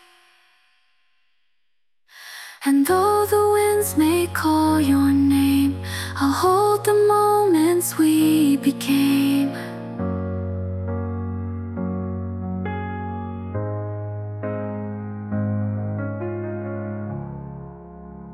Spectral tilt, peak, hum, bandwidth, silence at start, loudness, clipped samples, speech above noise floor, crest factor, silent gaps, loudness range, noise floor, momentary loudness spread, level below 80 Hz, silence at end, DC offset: -6 dB/octave; -6 dBFS; none; 15.5 kHz; 2.15 s; -21 LUFS; under 0.1%; 61 dB; 16 dB; none; 10 LU; -79 dBFS; 14 LU; -56 dBFS; 0 s; under 0.1%